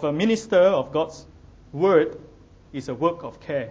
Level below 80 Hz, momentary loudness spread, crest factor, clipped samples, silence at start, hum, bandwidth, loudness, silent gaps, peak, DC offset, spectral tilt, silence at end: -54 dBFS; 17 LU; 18 dB; under 0.1%; 0 s; none; 8 kHz; -22 LUFS; none; -6 dBFS; under 0.1%; -6 dB/octave; 0 s